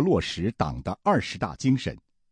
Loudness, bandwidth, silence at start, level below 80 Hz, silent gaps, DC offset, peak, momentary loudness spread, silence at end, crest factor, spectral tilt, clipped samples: -27 LUFS; 10.5 kHz; 0 s; -46 dBFS; none; under 0.1%; -10 dBFS; 7 LU; 0.35 s; 16 dB; -6 dB/octave; under 0.1%